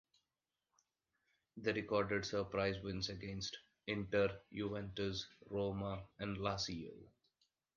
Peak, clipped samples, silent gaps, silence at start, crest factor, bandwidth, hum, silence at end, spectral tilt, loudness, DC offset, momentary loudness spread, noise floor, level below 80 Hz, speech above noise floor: -22 dBFS; under 0.1%; none; 1.55 s; 20 dB; 7.4 kHz; none; 0.7 s; -5 dB/octave; -41 LUFS; under 0.1%; 9 LU; under -90 dBFS; -64 dBFS; over 49 dB